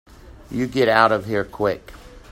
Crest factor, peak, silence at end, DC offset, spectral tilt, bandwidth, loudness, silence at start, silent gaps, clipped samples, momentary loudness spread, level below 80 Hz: 22 dB; 0 dBFS; 0.15 s; under 0.1%; -6 dB/octave; 16 kHz; -20 LUFS; 0.25 s; none; under 0.1%; 13 LU; -46 dBFS